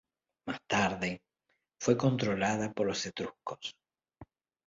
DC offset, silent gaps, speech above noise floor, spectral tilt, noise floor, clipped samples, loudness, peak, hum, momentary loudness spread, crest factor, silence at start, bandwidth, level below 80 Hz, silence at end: under 0.1%; none; 48 dB; -5 dB/octave; -80 dBFS; under 0.1%; -32 LUFS; -12 dBFS; none; 14 LU; 22 dB; 0.45 s; 7.8 kHz; -64 dBFS; 0.45 s